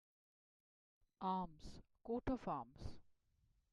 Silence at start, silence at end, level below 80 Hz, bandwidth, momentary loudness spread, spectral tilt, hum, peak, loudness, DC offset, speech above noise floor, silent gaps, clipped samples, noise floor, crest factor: 1.2 s; 0.7 s; -62 dBFS; 11 kHz; 16 LU; -7.5 dB/octave; none; -28 dBFS; -46 LUFS; under 0.1%; 35 dB; none; under 0.1%; -79 dBFS; 20 dB